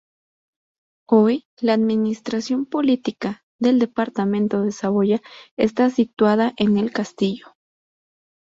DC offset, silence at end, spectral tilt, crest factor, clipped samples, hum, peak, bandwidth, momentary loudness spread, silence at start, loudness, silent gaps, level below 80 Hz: under 0.1%; 1.15 s; -6.5 dB/octave; 18 dB; under 0.1%; none; -2 dBFS; 7.8 kHz; 7 LU; 1.1 s; -20 LUFS; 1.45-1.57 s, 3.43-3.59 s, 5.51-5.57 s, 6.13-6.17 s; -62 dBFS